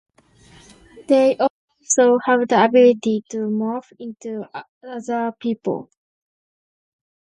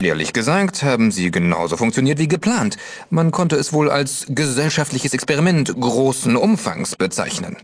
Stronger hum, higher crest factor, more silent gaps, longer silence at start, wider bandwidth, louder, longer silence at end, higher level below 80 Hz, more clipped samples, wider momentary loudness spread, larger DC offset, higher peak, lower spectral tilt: neither; about the same, 18 dB vs 16 dB; first, 1.50-1.68 s, 4.69-4.81 s vs none; first, 0.95 s vs 0 s; about the same, 10.5 kHz vs 11 kHz; about the same, -18 LUFS vs -18 LUFS; first, 1.4 s vs 0.05 s; second, -66 dBFS vs -52 dBFS; neither; first, 18 LU vs 4 LU; neither; about the same, -2 dBFS vs -2 dBFS; about the same, -4 dB/octave vs -5 dB/octave